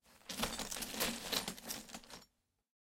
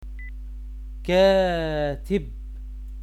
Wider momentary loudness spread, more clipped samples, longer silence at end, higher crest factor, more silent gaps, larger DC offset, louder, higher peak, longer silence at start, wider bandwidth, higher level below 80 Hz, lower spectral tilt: second, 14 LU vs 21 LU; neither; first, 0.75 s vs 0 s; first, 24 dB vs 16 dB; neither; neither; second, -40 LUFS vs -22 LUFS; second, -22 dBFS vs -8 dBFS; about the same, 0.05 s vs 0 s; first, 17 kHz vs 13 kHz; second, -62 dBFS vs -34 dBFS; second, -1.5 dB/octave vs -6.5 dB/octave